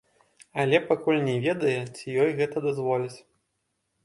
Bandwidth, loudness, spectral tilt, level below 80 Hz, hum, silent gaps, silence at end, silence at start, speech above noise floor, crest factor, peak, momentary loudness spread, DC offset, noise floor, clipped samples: 11.5 kHz; -26 LUFS; -6.5 dB/octave; -70 dBFS; none; none; 0.85 s; 0.55 s; 52 dB; 20 dB; -8 dBFS; 8 LU; under 0.1%; -77 dBFS; under 0.1%